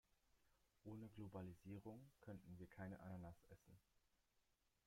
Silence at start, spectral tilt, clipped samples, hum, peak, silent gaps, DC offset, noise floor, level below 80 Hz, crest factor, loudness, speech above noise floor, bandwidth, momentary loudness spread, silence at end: 0.35 s; -8 dB/octave; under 0.1%; none; -42 dBFS; none; under 0.1%; -85 dBFS; -80 dBFS; 18 dB; -59 LUFS; 27 dB; 16 kHz; 6 LU; 0.45 s